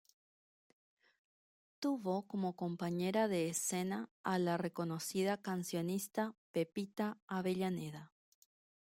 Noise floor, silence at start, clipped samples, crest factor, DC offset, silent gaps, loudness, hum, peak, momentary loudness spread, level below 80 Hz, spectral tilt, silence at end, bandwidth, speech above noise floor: under -90 dBFS; 1.8 s; under 0.1%; 18 dB; under 0.1%; 4.11-4.24 s, 6.38-6.54 s, 7.22-7.28 s; -39 LUFS; none; -22 dBFS; 6 LU; -82 dBFS; -5 dB/octave; 0.8 s; 16.5 kHz; over 52 dB